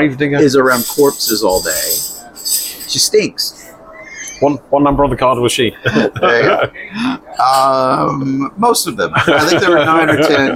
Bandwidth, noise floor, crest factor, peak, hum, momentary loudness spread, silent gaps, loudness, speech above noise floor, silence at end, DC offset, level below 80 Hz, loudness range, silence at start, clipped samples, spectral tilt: 17 kHz; -35 dBFS; 12 dB; 0 dBFS; none; 9 LU; none; -13 LUFS; 22 dB; 0 s; under 0.1%; -40 dBFS; 3 LU; 0 s; under 0.1%; -3.5 dB/octave